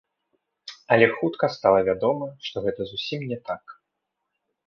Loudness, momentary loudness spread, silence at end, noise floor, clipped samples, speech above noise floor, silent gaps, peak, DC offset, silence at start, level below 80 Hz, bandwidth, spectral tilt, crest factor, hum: -24 LUFS; 16 LU; 0.95 s; -81 dBFS; under 0.1%; 58 dB; none; -2 dBFS; under 0.1%; 0.65 s; -60 dBFS; 7 kHz; -6.5 dB/octave; 22 dB; none